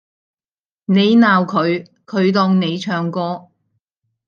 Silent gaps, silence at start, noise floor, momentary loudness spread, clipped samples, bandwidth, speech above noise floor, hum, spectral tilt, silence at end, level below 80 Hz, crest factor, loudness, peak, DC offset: none; 0.9 s; under -90 dBFS; 13 LU; under 0.1%; 7 kHz; over 75 dB; none; -7 dB/octave; 0.9 s; -66 dBFS; 16 dB; -16 LUFS; -2 dBFS; under 0.1%